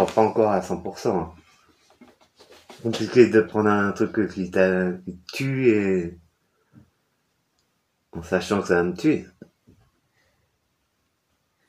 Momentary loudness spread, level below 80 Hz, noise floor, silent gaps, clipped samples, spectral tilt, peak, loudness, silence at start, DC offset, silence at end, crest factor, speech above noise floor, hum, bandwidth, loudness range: 14 LU; -58 dBFS; -72 dBFS; none; under 0.1%; -6.5 dB/octave; -2 dBFS; -22 LUFS; 0 s; under 0.1%; 2.45 s; 22 dB; 50 dB; none; 14.5 kHz; 6 LU